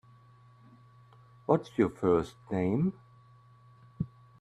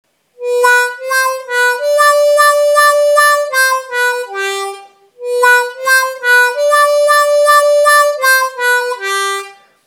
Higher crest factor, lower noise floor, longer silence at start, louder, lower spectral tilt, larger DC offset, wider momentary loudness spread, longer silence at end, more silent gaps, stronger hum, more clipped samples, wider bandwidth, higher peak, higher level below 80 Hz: first, 24 dB vs 12 dB; first, -58 dBFS vs -35 dBFS; first, 1.5 s vs 0.4 s; second, -31 LUFS vs -10 LUFS; first, -9 dB/octave vs 3 dB/octave; neither; first, 13 LU vs 9 LU; about the same, 0.35 s vs 0.35 s; neither; neither; neither; second, 10.5 kHz vs 19.5 kHz; second, -10 dBFS vs 0 dBFS; first, -62 dBFS vs -80 dBFS